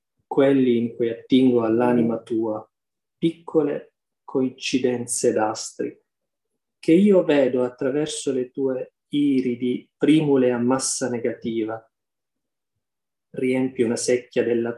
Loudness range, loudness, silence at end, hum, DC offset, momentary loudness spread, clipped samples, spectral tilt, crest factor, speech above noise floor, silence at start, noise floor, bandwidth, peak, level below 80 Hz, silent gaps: 5 LU; -22 LUFS; 0 s; none; under 0.1%; 11 LU; under 0.1%; -5 dB/octave; 16 dB; 68 dB; 0.3 s; -89 dBFS; 12.5 kHz; -6 dBFS; -68 dBFS; none